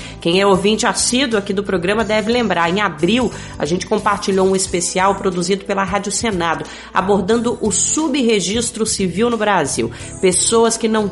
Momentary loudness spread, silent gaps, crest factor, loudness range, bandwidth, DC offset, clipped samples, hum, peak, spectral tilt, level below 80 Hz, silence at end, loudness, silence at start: 6 LU; none; 14 dB; 2 LU; 11.5 kHz; under 0.1%; under 0.1%; none; -2 dBFS; -3.5 dB/octave; -42 dBFS; 0 s; -16 LUFS; 0 s